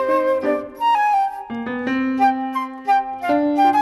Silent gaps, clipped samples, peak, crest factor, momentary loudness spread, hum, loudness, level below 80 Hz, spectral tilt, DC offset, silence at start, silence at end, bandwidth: none; under 0.1%; -6 dBFS; 12 dB; 9 LU; none; -20 LUFS; -58 dBFS; -5 dB/octave; under 0.1%; 0 s; 0 s; 13.5 kHz